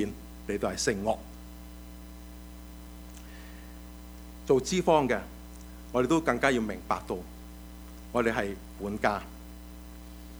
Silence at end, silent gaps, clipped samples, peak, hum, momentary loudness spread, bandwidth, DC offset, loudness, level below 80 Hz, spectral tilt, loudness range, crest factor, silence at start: 0 s; none; under 0.1%; -8 dBFS; 60 Hz at -45 dBFS; 21 LU; over 20 kHz; under 0.1%; -29 LUFS; -46 dBFS; -5 dB/octave; 9 LU; 24 dB; 0 s